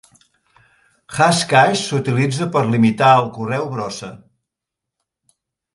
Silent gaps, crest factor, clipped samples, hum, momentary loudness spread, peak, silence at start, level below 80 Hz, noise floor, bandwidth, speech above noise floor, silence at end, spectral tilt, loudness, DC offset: none; 18 dB; under 0.1%; none; 14 LU; 0 dBFS; 1.1 s; -58 dBFS; -83 dBFS; 11.5 kHz; 67 dB; 1.55 s; -5 dB/octave; -16 LUFS; under 0.1%